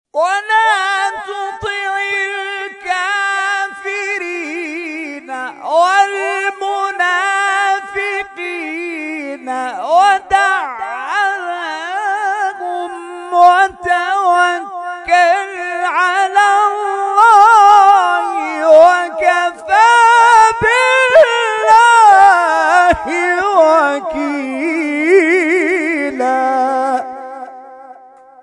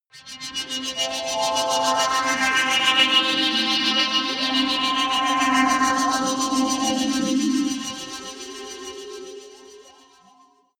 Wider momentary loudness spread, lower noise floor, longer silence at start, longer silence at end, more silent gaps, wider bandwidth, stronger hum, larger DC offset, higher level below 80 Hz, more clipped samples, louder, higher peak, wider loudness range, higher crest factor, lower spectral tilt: about the same, 15 LU vs 17 LU; second, -41 dBFS vs -56 dBFS; about the same, 0.15 s vs 0.15 s; second, 0.5 s vs 0.9 s; neither; second, 12 kHz vs 18 kHz; neither; neither; first, -50 dBFS vs -60 dBFS; first, 0.4% vs under 0.1%; first, -12 LUFS vs -20 LUFS; first, 0 dBFS vs -4 dBFS; about the same, 9 LU vs 8 LU; second, 12 dB vs 18 dB; first, -2.5 dB/octave vs -1 dB/octave